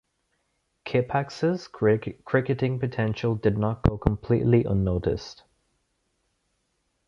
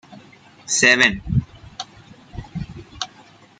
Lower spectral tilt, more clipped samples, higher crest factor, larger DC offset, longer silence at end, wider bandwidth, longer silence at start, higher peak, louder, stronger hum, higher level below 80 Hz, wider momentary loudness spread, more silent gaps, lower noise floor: first, -8.5 dB/octave vs -2.5 dB/octave; neither; about the same, 24 dB vs 22 dB; neither; first, 1.75 s vs 0.55 s; second, 7.4 kHz vs 9.6 kHz; first, 0.85 s vs 0.1 s; about the same, -2 dBFS vs -2 dBFS; second, -25 LUFS vs -16 LUFS; neither; about the same, -42 dBFS vs -42 dBFS; second, 6 LU vs 25 LU; neither; first, -74 dBFS vs -49 dBFS